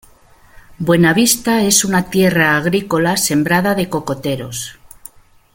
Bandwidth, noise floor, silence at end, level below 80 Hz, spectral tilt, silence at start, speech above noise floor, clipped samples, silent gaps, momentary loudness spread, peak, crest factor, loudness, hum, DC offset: 17 kHz; -46 dBFS; 0.45 s; -46 dBFS; -4 dB/octave; 0.7 s; 32 dB; under 0.1%; none; 11 LU; 0 dBFS; 16 dB; -14 LUFS; none; under 0.1%